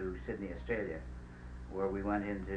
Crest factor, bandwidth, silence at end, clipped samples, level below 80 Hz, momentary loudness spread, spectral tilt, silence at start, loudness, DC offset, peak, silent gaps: 18 dB; 9.6 kHz; 0 s; under 0.1%; -48 dBFS; 14 LU; -8.5 dB/octave; 0 s; -39 LUFS; under 0.1%; -20 dBFS; none